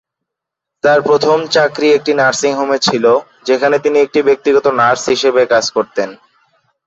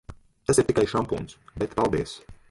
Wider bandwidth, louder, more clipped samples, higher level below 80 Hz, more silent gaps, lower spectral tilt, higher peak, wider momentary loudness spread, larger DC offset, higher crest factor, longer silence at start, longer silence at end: second, 8 kHz vs 11.5 kHz; first, -12 LUFS vs -26 LUFS; neither; second, -56 dBFS vs -46 dBFS; neither; second, -3.5 dB/octave vs -5 dB/octave; first, -2 dBFS vs -6 dBFS; second, 6 LU vs 14 LU; neither; second, 12 dB vs 20 dB; first, 0.85 s vs 0.1 s; first, 0.7 s vs 0.15 s